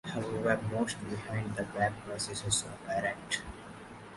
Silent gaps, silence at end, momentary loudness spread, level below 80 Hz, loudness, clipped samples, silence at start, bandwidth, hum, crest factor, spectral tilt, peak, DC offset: none; 0 s; 10 LU; -58 dBFS; -34 LUFS; under 0.1%; 0.05 s; 11.5 kHz; none; 20 dB; -3.5 dB/octave; -14 dBFS; under 0.1%